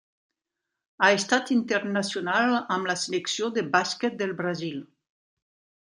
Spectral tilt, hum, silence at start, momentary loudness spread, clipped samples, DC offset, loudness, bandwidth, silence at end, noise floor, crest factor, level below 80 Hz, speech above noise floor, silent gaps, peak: -3.5 dB/octave; none; 1 s; 8 LU; under 0.1%; under 0.1%; -25 LUFS; 11 kHz; 1.1 s; -85 dBFS; 22 dB; -76 dBFS; 60 dB; none; -6 dBFS